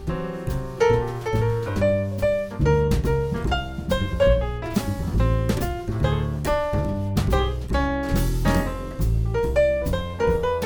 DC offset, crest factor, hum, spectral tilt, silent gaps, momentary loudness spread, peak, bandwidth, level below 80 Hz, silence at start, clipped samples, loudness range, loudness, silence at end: under 0.1%; 16 dB; none; -7 dB/octave; none; 6 LU; -6 dBFS; over 20 kHz; -28 dBFS; 0 s; under 0.1%; 1 LU; -23 LUFS; 0 s